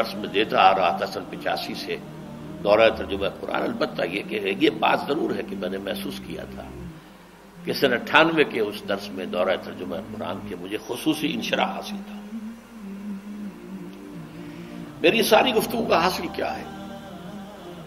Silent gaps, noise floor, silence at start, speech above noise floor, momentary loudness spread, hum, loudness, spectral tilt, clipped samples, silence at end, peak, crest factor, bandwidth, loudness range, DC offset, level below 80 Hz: none; -47 dBFS; 0 s; 23 dB; 20 LU; none; -23 LUFS; -4.5 dB/octave; under 0.1%; 0 s; 0 dBFS; 24 dB; 16 kHz; 6 LU; under 0.1%; -54 dBFS